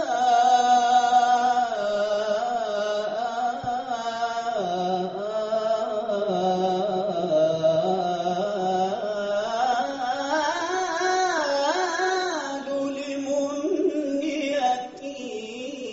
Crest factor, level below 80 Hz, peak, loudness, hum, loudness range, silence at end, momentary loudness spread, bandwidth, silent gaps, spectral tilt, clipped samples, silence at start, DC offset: 14 dB; -66 dBFS; -10 dBFS; -24 LUFS; none; 4 LU; 0 s; 9 LU; 8 kHz; none; -2.5 dB/octave; under 0.1%; 0 s; under 0.1%